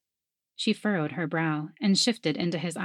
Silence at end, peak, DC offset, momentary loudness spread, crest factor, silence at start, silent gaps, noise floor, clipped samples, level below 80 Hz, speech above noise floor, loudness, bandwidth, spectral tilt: 0 s; -12 dBFS; under 0.1%; 6 LU; 16 dB; 0.6 s; none; -88 dBFS; under 0.1%; -80 dBFS; 61 dB; -27 LUFS; 13.5 kHz; -4.5 dB/octave